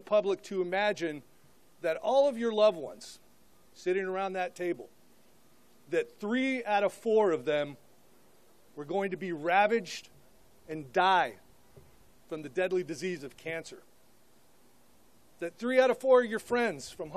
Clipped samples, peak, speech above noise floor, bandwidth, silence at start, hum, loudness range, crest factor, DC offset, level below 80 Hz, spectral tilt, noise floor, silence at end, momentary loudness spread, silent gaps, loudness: under 0.1%; -12 dBFS; 35 dB; 14 kHz; 0.1 s; none; 7 LU; 20 dB; 0.1%; -74 dBFS; -4.5 dB/octave; -65 dBFS; 0 s; 16 LU; none; -30 LUFS